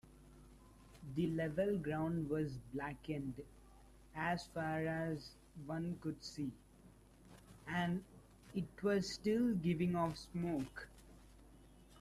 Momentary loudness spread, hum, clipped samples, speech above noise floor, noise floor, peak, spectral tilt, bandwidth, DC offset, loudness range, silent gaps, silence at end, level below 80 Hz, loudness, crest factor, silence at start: 18 LU; none; under 0.1%; 24 dB; -63 dBFS; -26 dBFS; -6.5 dB/octave; 14 kHz; under 0.1%; 6 LU; none; 0 s; -64 dBFS; -41 LUFS; 16 dB; 0.05 s